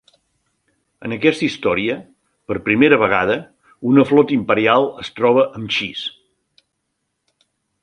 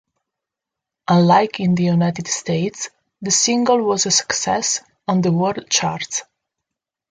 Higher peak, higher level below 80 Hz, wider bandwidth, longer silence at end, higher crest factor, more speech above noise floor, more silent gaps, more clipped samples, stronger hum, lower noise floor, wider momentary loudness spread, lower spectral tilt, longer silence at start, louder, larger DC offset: about the same, 0 dBFS vs -2 dBFS; about the same, -54 dBFS vs -58 dBFS; about the same, 10.5 kHz vs 9.6 kHz; first, 1.75 s vs 0.9 s; about the same, 18 dB vs 18 dB; second, 57 dB vs 67 dB; neither; neither; neither; second, -74 dBFS vs -85 dBFS; first, 14 LU vs 10 LU; first, -6 dB/octave vs -4 dB/octave; about the same, 1 s vs 1.1 s; about the same, -17 LUFS vs -18 LUFS; neither